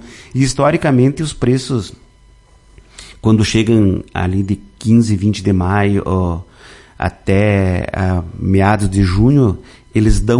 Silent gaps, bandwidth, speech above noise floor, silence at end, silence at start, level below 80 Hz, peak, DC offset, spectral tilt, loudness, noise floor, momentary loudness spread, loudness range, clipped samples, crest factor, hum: none; 11.5 kHz; 33 dB; 0 s; 0.05 s; -28 dBFS; 0 dBFS; under 0.1%; -6.5 dB/octave; -15 LUFS; -46 dBFS; 9 LU; 3 LU; under 0.1%; 14 dB; none